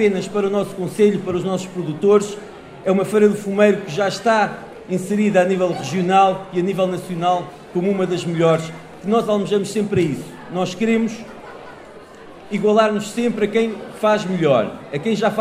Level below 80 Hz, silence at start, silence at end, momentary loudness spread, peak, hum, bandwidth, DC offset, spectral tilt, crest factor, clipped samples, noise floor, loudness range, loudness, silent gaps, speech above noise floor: -56 dBFS; 0 s; 0 s; 12 LU; 0 dBFS; none; 15 kHz; under 0.1%; -6 dB/octave; 18 dB; under 0.1%; -40 dBFS; 4 LU; -19 LUFS; none; 21 dB